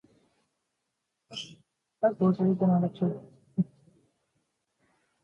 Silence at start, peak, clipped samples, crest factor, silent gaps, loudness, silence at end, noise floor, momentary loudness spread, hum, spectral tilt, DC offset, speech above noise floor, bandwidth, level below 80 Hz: 1.3 s; -12 dBFS; under 0.1%; 18 dB; none; -28 LUFS; 1.6 s; -82 dBFS; 16 LU; none; -8.5 dB/octave; under 0.1%; 57 dB; 7.2 kHz; -72 dBFS